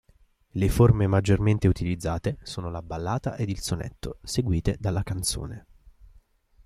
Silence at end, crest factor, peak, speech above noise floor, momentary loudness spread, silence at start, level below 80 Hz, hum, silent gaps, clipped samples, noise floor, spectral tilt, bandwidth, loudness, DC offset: 1.05 s; 18 dB; -8 dBFS; 36 dB; 14 LU; 0.55 s; -40 dBFS; none; none; under 0.1%; -61 dBFS; -6 dB/octave; 15 kHz; -26 LUFS; under 0.1%